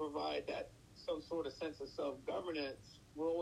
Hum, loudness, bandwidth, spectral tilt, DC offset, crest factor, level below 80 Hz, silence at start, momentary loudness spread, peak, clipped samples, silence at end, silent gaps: none; -43 LUFS; 13 kHz; -5 dB/octave; under 0.1%; 14 dB; -68 dBFS; 0 s; 9 LU; -28 dBFS; under 0.1%; 0 s; none